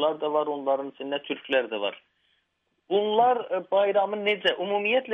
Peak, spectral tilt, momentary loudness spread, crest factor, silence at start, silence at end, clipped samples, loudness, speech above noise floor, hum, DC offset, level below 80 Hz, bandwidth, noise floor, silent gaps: -10 dBFS; -5.5 dB/octave; 9 LU; 16 dB; 0 s; 0 s; under 0.1%; -26 LUFS; 49 dB; none; under 0.1%; -78 dBFS; 6.2 kHz; -75 dBFS; none